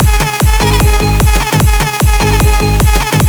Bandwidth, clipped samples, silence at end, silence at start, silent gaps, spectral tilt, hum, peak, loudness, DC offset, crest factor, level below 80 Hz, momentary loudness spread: over 20 kHz; under 0.1%; 0 s; 0 s; none; -4.5 dB/octave; none; 0 dBFS; -10 LUFS; under 0.1%; 8 dB; -12 dBFS; 1 LU